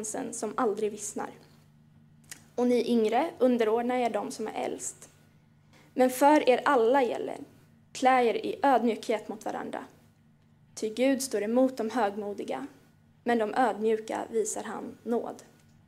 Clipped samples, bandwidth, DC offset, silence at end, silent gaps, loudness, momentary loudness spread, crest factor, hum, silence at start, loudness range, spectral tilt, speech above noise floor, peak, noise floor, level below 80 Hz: under 0.1%; 16 kHz; under 0.1%; 0.45 s; none; -28 LUFS; 15 LU; 20 dB; none; 0 s; 5 LU; -3.5 dB/octave; 34 dB; -10 dBFS; -61 dBFS; -76 dBFS